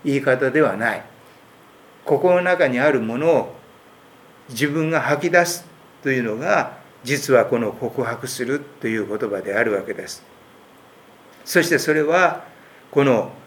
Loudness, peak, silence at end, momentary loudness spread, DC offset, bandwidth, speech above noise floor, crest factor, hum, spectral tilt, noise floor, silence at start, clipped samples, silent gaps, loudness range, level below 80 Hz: -20 LUFS; 0 dBFS; 0.05 s; 13 LU; under 0.1%; 19.5 kHz; 29 dB; 20 dB; none; -5 dB/octave; -48 dBFS; 0.05 s; under 0.1%; none; 5 LU; -70 dBFS